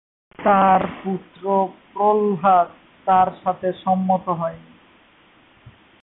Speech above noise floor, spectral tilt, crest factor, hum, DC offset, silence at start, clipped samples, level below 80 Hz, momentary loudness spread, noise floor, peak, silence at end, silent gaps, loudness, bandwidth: 34 dB; -11.5 dB/octave; 16 dB; none; under 0.1%; 0.4 s; under 0.1%; -58 dBFS; 11 LU; -53 dBFS; -6 dBFS; 1.45 s; none; -20 LUFS; 4 kHz